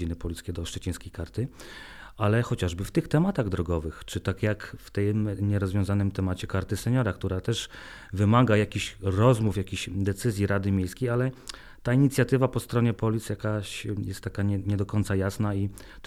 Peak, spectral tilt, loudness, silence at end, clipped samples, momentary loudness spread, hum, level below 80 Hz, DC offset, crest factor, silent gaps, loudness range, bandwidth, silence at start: -8 dBFS; -6.5 dB/octave; -27 LUFS; 0 s; under 0.1%; 12 LU; none; -46 dBFS; under 0.1%; 18 dB; none; 3 LU; 14.5 kHz; 0 s